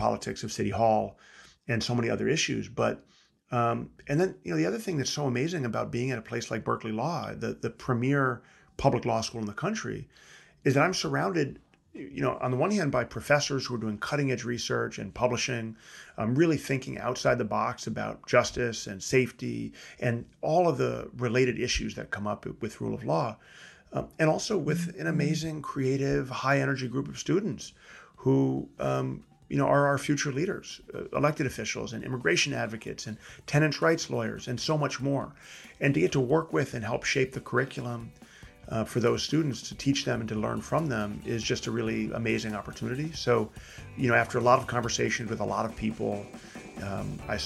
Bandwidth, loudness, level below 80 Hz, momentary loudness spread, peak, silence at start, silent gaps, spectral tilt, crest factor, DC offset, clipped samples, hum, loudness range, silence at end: 12.5 kHz; -29 LUFS; -54 dBFS; 11 LU; -6 dBFS; 0 s; none; -5 dB/octave; 22 dB; under 0.1%; under 0.1%; none; 2 LU; 0 s